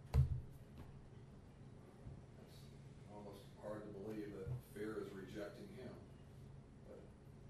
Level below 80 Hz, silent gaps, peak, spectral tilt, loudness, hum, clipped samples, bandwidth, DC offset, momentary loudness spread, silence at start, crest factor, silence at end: -54 dBFS; none; -24 dBFS; -8 dB/octave; -51 LUFS; none; under 0.1%; 13 kHz; under 0.1%; 12 LU; 0 s; 24 dB; 0 s